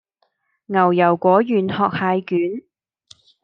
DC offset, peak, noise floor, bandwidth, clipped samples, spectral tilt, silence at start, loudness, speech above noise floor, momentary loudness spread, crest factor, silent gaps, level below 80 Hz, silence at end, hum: under 0.1%; -2 dBFS; -68 dBFS; 7.2 kHz; under 0.1%; -8.5 dB/octave; 0.7 s; -18 LUFS; 51 dB; 8 LU; 18 dB; none; -70 dBFS; 0.85 s; none